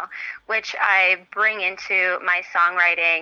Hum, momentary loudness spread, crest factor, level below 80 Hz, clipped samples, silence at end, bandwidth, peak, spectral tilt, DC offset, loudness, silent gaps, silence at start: none; 8 LU; 16 dB; -70 dBFS; under 0.1%; 0 s; 9.2 kHz; -4 dBFS; -1 dB/octave; under 0.1%; -19 LUFS; none; 0 s